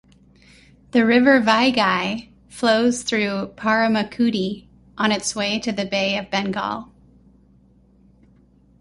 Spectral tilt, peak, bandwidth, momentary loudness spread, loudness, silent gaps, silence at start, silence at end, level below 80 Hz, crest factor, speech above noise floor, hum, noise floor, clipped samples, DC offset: -4 dB/octave; -2 dBFS; 11.5 kHz; 12 LU; -20 LUFS; none; 0.95 s; 1.95 s; -56 dBFS; 20 dB; 35 dB; none; -54 dBFS; under 0.1%; under 0.1%